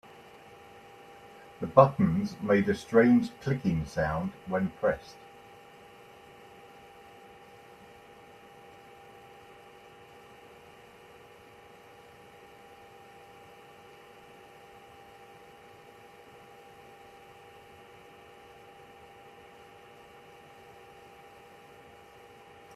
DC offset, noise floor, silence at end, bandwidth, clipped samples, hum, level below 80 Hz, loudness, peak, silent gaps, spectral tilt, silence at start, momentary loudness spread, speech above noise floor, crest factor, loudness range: under 0.1%; -53 dBFS; 17.65 s; 13.5 kHz; under 0.1%; none; -60 dBFS; -27 LUFS; -4 dBFS; none; -7.5 dB/octave; 1.6 s; 26 LU; 27 dB; 30 dB; 26 LU